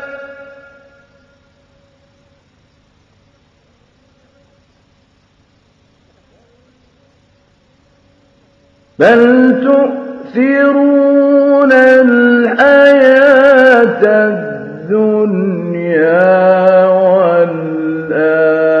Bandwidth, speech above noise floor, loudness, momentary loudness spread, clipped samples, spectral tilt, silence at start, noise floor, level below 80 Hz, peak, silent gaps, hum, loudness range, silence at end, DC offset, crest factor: 6.6 kHz; 45 dB; -9 LUFS; 12 LU; 0.5%; -7.5 dB/octave; 0 s; -52 dBFS; -58 dBFS; 0 dBFS; none; none; 6 LU; 0 s; under 0.1%; 12 dB